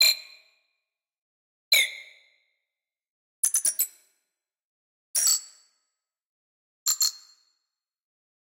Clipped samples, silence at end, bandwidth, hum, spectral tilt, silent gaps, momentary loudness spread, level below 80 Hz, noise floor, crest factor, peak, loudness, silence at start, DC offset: under 0.1%; 1.4 s; 17 kHz; none; 6.5 dB/octave; 1.22-1.71 s, 3.10-3.43 s, 4.64-5.14 s, 6.26-6.86 s; 8 LU; under -90 dBFS; -89 dBFS; 22 dB; -10 dBFS; -24 LUFS; 0 s; under 0.1%